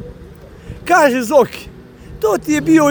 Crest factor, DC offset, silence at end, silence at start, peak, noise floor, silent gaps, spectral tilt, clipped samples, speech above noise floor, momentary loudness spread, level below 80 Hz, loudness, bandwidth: 16 dB; under 0.1%; 0 s; 0 s; 0 dBFS; -37 dBFS; none; -5 dB/octave; under 0.1%; 24 dB; 20 LU; -42 dBFS; -14 LUFS; over 20 kHz